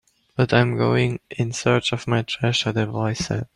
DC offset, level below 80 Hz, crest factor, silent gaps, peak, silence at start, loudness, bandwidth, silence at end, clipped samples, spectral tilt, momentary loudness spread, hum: under 0.1%; -52 dBFS; 18 dB; none; -4 dBFS; 0.4 s; -22 LUFS; 11 kHz; 0.1 s; under 0.1%; -5.5 dB/octave; 7 LU; none